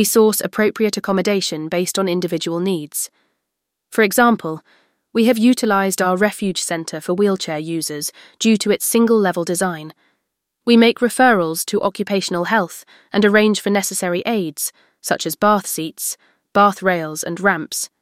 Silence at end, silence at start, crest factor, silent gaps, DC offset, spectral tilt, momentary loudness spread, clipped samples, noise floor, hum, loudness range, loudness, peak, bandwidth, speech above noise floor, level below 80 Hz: 0.15 s; 0 s; 16 dB; none; under 0.1%; -4 dB/octave; 11 LU; under 0.1%; -78 dBFS; none; 3 LU; -18 LUFS; -2 dBFS; 16.5 kHz; 61 dB; -62 dBFS